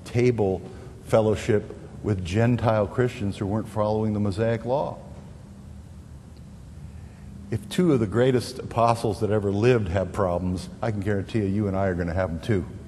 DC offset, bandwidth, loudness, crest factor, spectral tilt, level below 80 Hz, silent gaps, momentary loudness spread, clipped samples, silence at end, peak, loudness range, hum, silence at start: under 0.1%; 12.5 kHz; -25 LUFS; 20 dB; -7.5 dB/octave; -46 dBFS; none; 22 LU; under 0.1%; 0 s; -4 dBFS; 7 LU; none; 0 s